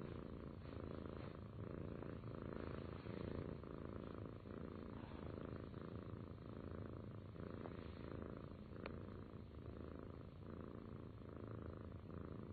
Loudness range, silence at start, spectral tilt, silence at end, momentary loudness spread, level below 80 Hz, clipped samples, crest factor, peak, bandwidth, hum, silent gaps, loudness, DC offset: 3 LU; 0 s; -7.5 dB/octave; 0 s; 4 LU; -62 dBFS; under 0.1%; 18 dB; -34 dBFS; 4.6 kHz; none; none; -53 LUFS; under 0.1%